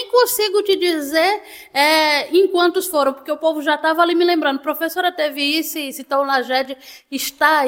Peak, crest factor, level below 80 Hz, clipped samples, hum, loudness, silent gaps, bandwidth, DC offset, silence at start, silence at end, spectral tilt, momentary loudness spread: -2 dBFS; 16 dB; -64 dBFS; under 0.1%; none; -17 LUFS; none; 17 kHz; under 0.1%; 0 s; 0 s; -1 dB/octave; 10 LU